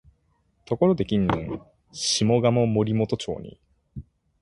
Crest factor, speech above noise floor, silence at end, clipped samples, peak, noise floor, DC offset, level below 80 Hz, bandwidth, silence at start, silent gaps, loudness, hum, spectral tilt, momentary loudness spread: 18 dB; 44 dB; 0.4 s; under 0.1%; -6 dBFS; -67 dBFS; under 0.1%; -50 dBFS; 11.5 kHz; 0.7 s; none; -23 LUFS; none; -5.5 dB/octave; 23 LU